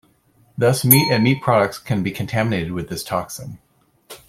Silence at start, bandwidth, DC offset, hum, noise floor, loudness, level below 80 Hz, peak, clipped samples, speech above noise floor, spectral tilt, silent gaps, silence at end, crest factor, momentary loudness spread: 0.55 s; 16.5 kHz; under 0.1%; none; -57 dBFS; -18 LUFS; -52 dBFS; 0 dBFS; under 0.1%; 39 dB; -5 dB/octave; none; 0.1 s; 20 dB; 18 LU